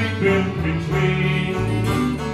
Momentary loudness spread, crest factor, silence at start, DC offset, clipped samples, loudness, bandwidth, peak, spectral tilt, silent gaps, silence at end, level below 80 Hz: 3 LU; 14 dB; 0 s; under 0.1%; under 0.1%; -20 LUFS; 13.5 kHz; -6 dBFS; -7 dB/octave; none; 0 s; -36 dBFS